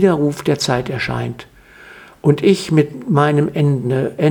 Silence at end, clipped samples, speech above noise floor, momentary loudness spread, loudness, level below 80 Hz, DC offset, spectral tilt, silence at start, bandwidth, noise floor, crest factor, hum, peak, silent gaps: 0 s; under 0.1%; 26 dB; 7 LU; -17 LUFS; -48 dBFS; under 0.1%; -6.5 dB/octave; 0 s; 17 kHz; -41 dBFS; 16 dB; none; 0 dBFS; none